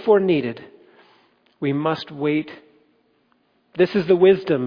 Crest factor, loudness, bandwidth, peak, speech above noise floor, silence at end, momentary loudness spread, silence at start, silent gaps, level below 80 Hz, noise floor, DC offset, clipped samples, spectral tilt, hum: 18 dB; -20 LUFS; 5.2 kHz; -4 dBFS; 45 dB; 0 s; 18 LU; 0 s; none; -62 dBFS; -64 dBFS; under 0.1%; under 0.1%; -8.5 dB/octave; none